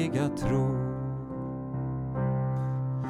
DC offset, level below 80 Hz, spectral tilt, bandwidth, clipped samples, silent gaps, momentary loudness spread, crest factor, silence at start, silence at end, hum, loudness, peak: under 0.1%; -48 dBFS; -8.5 dB/octave; 11 kHz; under 0.1%; none; 8 LU; 16 dB; 0 s; 0 s; none; -31 LUFS; -14 dBFS